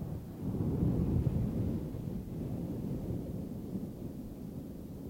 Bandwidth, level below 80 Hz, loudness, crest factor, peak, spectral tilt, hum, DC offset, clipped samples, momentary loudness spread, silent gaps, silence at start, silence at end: 16.5 kHz; -46 dBFS; -37 LUFS; 16 dB; -18 dBFS; -9.5 dB/octave; none; under 0.1%; under 0.1%; 12 LU; none; 0 s; 0 s